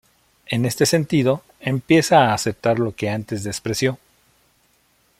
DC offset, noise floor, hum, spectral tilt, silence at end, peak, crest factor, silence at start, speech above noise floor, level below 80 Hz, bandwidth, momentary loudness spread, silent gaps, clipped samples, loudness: under 0.1%; -61 dBFS; none; -5 dB/octave; 1.25 s; -2 dBFS; 18 dB; 0.5 s; 42 dB; -54 dBFS; 16.5 kHz; 11 LU; none; under 0.1%; -20 LUFS